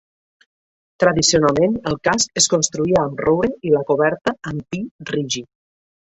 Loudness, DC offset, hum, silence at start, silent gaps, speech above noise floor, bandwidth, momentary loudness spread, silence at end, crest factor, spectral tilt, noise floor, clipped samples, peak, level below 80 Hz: -18 LUFS; under 0.1%; none; 1 s; 4.91-4.99 s; over 72 dB; 8.4 kHz; 12 LU; 0.7 s; 18 dB; -3.5 dB/octave; under -90 dBFS; under 0.1%; -2 dBFS; -48 dBFS